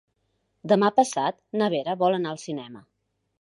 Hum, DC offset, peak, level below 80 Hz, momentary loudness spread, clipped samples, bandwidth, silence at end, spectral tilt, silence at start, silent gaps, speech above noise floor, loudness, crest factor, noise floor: none; under 0.1%; -6 dBFS; -76 dBFS; 15 LU; under 0.1%; 11.5 kHz; 0.6 s; -5 dB/octave; 0.65 s; none; 49 dB; -24 LUFS; 20 dB; -73 dBFS